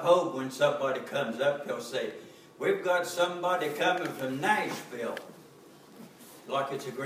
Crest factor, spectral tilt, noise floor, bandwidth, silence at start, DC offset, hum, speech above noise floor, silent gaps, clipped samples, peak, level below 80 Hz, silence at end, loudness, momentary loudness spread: 20 dB; -4 dB/octave; -54 dBFS; 16 kHz; 0 s; under 0.1%; none; 24 dB; none; under 0.1%; -10 dBFS; -84 dBFS; 0 s; -30 LUFS; 20 LU